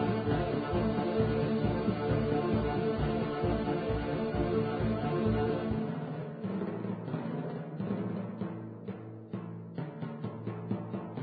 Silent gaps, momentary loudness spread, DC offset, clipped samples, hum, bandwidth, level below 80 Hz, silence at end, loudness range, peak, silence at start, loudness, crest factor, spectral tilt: none; 11 LU; under 0.1%; under 0.1%; none; 4.9 kHz; -48 dBFS; 0 s; 8 LU; -16 dBFS; 0 s; -33 LUFS; 16 dB; -11.5 dB/octave